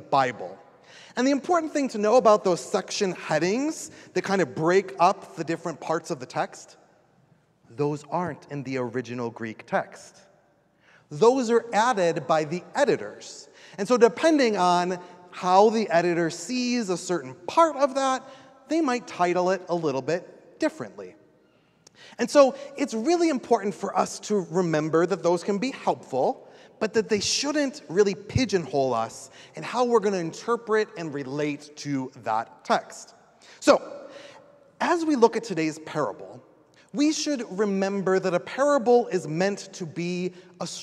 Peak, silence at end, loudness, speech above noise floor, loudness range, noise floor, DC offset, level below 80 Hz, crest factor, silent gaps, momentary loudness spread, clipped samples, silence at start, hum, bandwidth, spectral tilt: -4 dBFS; 0 s; -25 LUFS; 38 dB; 6 LU; -63 dBFS; under 0.1%; -62 dBFS; 22 dB; none; 14 LU; under 0.1%; 0 s; none; 13 kHz; -4.5 dB/octave